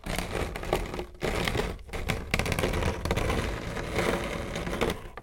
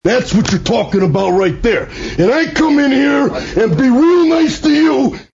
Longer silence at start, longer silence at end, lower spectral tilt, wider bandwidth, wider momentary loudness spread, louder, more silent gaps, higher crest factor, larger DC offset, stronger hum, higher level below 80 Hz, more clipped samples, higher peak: about the same, 0.05 s vs 0.05 s; about the same, 0 s vs 0.1 s; about the same, -5 dB/octave vs -6 dB/octave; first, 17 kHz vs 7.8 kHz; about the same, 5 LU vs 5 LU; second, -31 LUFS vs -12 LUFS; neither; first, 22 dB vs 12 dB; neither; neither; about the same, -38 dBFS vs -34 dBFS; neither; second, -8 dBFS vs 0 dBFS